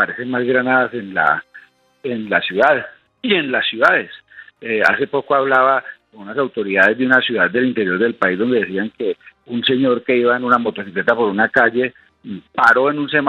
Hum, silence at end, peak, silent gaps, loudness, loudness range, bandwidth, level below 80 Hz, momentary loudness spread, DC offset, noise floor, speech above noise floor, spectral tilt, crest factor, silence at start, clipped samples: none; 0 s; 0 dBFS; none; -16 LUFS; 2 LU; 10 kHz; -64 dBFS; 13 LU; under 0.1%; -45 dBFS; 29 dB; -6 dB/octave; 18 dB; 0 s; under 0.1%